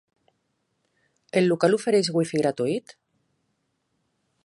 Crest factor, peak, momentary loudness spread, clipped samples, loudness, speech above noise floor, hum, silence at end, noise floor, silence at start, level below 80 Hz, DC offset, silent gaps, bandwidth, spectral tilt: 20 dB; -6 dBFS; 7 LU; under 0.1%; -23 LUFS; 52 dB; none; 1.65 s; -74 dBFS; 1.35 s; -74 dBFS; under 0.1%; none; 11.5 kHz; -5.5 dB/octave